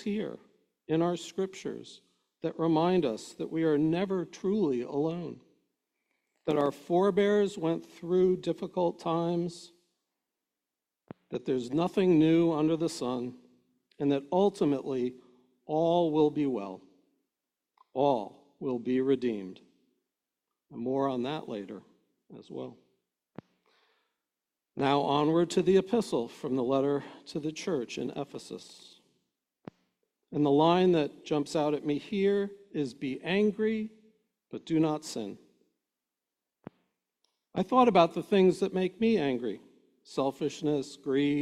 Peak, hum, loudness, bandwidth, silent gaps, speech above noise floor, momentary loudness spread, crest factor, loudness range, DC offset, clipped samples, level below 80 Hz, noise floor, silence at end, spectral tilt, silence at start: -10 dBFS; none; -29 LUFS; 12.5 kHz; none; 61 dB; 15 LU; 22 dB; 9 LU; under 0.1%; under 0.1%; -70 dBFS; -90 dBFS; 0 s; -6.5 dB/octave; 0 s